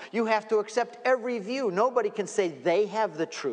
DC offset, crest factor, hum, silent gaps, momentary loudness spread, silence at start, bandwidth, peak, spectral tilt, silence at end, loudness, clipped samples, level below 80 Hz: under 0.1%; 16 dB; none; none; 4 LU; 0 s; 10 kHz; -10 dBFS; -4.5 dB/octave; 0 s; -27 LUFS; under 0.1%; -88 dBFS